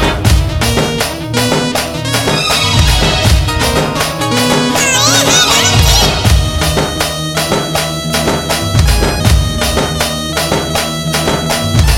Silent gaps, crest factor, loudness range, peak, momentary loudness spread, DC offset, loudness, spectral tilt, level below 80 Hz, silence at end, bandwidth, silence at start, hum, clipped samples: none; 12 dB; 4 LU; 0 dBFS; 7 LU; under 0.1%; -11 LUFS; -3.5 dB/octave; -18 dBFS; 0 s; 17 kHz; 0 s; none; under 0.1%